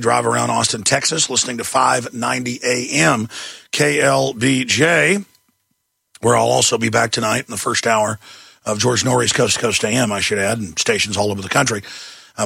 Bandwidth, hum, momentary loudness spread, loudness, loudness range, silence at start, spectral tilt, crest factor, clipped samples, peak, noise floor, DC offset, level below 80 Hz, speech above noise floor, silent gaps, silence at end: 16.5 kHz; none; 7 LU; -16 LUFS; 1 LU; 0 s; -3 dB/octave; 18 dB; under 0.1%; 0 dBFS; -70 dBFS; under 0.1%; -54 dBFS; 53 dB; none; 0 s